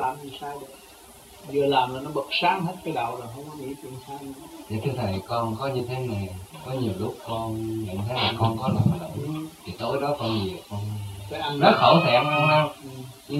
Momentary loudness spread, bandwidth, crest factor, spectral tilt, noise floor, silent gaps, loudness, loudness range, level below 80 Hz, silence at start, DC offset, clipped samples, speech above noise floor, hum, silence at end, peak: 19 LU; 16 kHz; 24 dB; -6 dB/octave; -48 dBFS; none; -25 LUFS; 9 LU; -54 dBFS; 0 s; under 0.1%; under 0.1%; 22 dB; none; 0 s; -2 dBFS